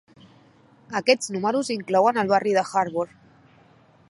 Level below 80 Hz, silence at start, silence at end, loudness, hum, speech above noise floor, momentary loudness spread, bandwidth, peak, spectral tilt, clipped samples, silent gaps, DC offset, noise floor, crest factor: -70 dBFS; 0.9 s; 1.05 s; -23 LUFS; none; 33 dB; 9 LU; 11.5 kHz; -4 dBFS; -4 dB/octave; under 0.1%; none; under 0.1%; -55 dBFS; 20 dB